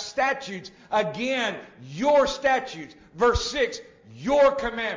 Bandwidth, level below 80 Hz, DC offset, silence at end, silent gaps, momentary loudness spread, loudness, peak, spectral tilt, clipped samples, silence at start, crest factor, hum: 7.6 kHz; -44 dBFS; under 0.1%; 0 s; none; 18 LU; -24 LUFS; -10 dBFS; -4 dB/octave; under 0.1%; 0 s; 16 dB; none